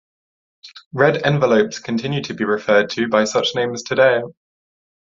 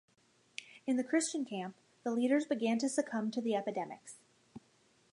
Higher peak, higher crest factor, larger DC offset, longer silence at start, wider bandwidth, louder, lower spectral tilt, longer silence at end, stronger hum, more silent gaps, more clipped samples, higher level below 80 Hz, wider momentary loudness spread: first, -2 dBFS vs -18 dBFS; about the same, 18 dB vs 18 dB; neither; about the same, 0.65 s vs 0.6 s; second, 7.6 kHz vs 11.5 kHz; first, -18 LUFS vs -35 LUFS; about the same, -5 dB/octave vs -4 dB/octave; first, 0.85 s vs 0.55 s; neither; first, 0.86-0.91 s vs none; neither; first, -60 dBFS vs -86 dBFS; second, 8 LU vs 17 LU